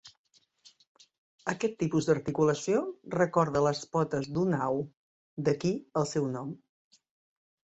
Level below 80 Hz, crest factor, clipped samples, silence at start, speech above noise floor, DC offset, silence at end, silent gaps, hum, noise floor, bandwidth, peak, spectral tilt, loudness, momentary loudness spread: -64 dBFS; 20 dB; under 0.1%; 0.05 s; 33 dB; under 0.1%; 1.2 s; 0.17-0.24 s, 0.87-0.95 s, 1.18-1.39 s, 4.97-5.37 s; none; -62 dBFS; 8.2 kHz; -12 dBFS; -6 dB/octave; -30 LUFS; 11 LU